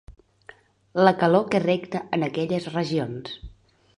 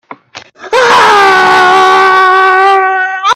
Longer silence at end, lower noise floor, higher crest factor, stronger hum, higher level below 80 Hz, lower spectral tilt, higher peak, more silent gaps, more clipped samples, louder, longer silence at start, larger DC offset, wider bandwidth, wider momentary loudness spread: first, 0.5 s vs 0 s; first, -51 dBFS vs -33 dBFS; first, 22 dB vs 6 dB; neither; about the same, -54 dBFS vs -50 dBFS; first, -7 dB/octave vs -2 dB/octave; about the same, -2 dBFS vs 0 dBFS; neither; second, under 0.1% vs 0.5%; second, -23 LUFS vs -5 LUFS; about the same, 0.1 s vs 0.1 s; neither; second, 11 kHz vs 14 kHz; first, 14 LU vs 6 LU